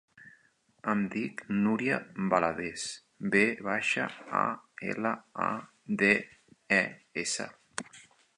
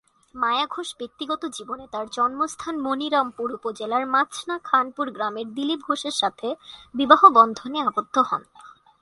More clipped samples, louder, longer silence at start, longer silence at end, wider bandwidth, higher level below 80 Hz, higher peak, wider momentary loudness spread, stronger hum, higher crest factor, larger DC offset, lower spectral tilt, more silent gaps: neither; second, -30 LUFS vs -22 LUFS; second, 0.2 s vs 0.35 s; about the same, 0.35 s vs 0.3 s; about the same, 11 kHz vs 11.5 kHz; about the same, -70 dBFS vs -66 dBFS; second, -10 dBFS vs 0 dBFS; about the same, 13 LU vs 14 LU; neither; about the same, 22 dB vs 22 dB; neither; first, -4.5 dB/octave vs -2.5 dB/octave; neither